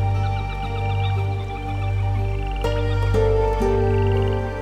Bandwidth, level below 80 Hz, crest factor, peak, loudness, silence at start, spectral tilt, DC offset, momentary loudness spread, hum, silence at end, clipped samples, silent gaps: 8.4 kHz; -28 dBFS; 12 dB; -8 dBFS; -22 LUFS; 0 s; -7.5 dB/octave; 0.2%; 7 LU; 50 Hz at -30 dBFS; 0 s; under 0.1%; none